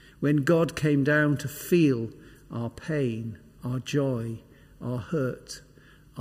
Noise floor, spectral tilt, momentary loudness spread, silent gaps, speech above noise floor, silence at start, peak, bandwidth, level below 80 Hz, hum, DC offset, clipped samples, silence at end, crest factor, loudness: -54 dBFS; -6.5 dB/octave; 17 LU; none; 28 dB; 0.2 s; -12 dBFS; 16 kHz; -58 dBFS; none; under 0.1%; under 0.1%; 0 s; 16 dB; -27 LUFS